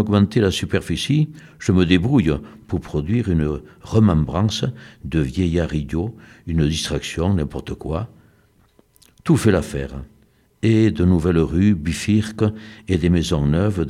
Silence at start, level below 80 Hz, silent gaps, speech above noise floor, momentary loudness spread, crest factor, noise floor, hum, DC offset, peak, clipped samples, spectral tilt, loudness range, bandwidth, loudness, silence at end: 0 s; -34 dBFS; none; 38 dB; 12 LU; 18 dB; -57 dBFS; none; under 0.1%; -2 dBFS; under 0.1%; -6.5 dB/octave; 5 LU; 14 kHz; -20 LUFS; 0 s